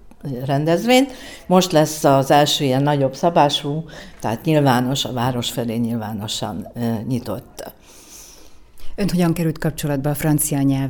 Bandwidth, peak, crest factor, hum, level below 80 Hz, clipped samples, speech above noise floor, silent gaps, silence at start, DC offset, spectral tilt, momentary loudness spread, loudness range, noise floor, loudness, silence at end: over 20 kHz; 0 dBFS; 18 dB; none; -44 dBFS; under 0.1%; 23 dB; none; 0.05 s; under 0.1%; -5 dB/octave; 15 LU; 9 LU; -42 dBFS; -19 LUFS; 0 s